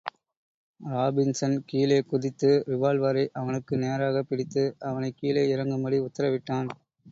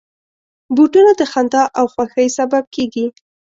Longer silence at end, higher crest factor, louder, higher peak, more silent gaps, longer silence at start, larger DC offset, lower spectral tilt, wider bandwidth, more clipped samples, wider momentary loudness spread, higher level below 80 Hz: second, 0 s vs 0.35 s; about the same, 16 dB vs 14 dB; second, -27 LUFS vs -14 LUFS; second, -10 dBFS vs -2 dBFS; first, 0.37-0.74 s vs 2.67-2.71 s; second, 0.05 s vs 0.7 s; neither; first, -6.5 dB/octave vs -4 dB/octave; about the same, 7.8 kHz vs 7.8 kHz; neither; second, 8 LU vs 11 LU; second, -66 dBFS vs -58 dBFS